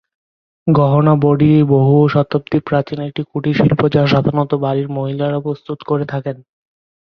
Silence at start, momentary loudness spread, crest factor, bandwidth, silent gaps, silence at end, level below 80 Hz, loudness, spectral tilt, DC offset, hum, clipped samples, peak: 0.65 s; 12 LU; 14 dB; 6 kHz; none; 0.6 s; -48 dBFS; -15 LUFS; -10 dB/octave; under 0.1%; none; under 0.1%; -2 dBFS